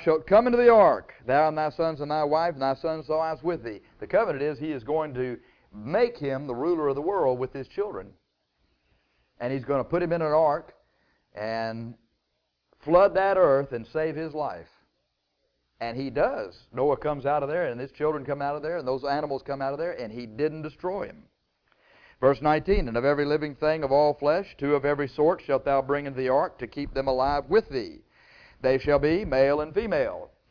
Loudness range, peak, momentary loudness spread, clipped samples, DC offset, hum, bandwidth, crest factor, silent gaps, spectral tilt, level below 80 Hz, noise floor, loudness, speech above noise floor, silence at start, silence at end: 6 LU; -8 dBFS; 12 LU; under 0.1%; under 0.1%; none; 5.4 kHz; 18 dB; none; -8.5 dB/octave; -48 dBFS; -77 dBFS; -26 LUFS; 52 dB; 0 s; 0.25 s